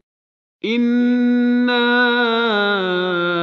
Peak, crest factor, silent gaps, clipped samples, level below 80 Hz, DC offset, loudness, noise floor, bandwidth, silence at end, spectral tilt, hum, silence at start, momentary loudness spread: -4 dBFS; 14 dB; none; under 0.1%; -72 dBFS; under 0.1%; -16 LUFS; under -90 dBFS; 6 kHz; 0 s; -6.5 dB/octave; none; 0.65 s; 4 LU